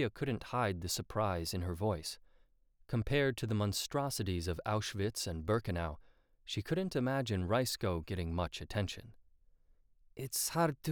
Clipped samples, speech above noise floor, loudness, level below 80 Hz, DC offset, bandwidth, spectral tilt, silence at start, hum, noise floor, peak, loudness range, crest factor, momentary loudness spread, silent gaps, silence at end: under 0.1%; 32 dB; -36 LUFS; -54 dBFS; under 0.1%; over 20 kHz; -5 dB/octave; 0 s; none; -67 dBFS; -20 dBFS; 2 LU; 18 dB; 9 LU; none; 0 s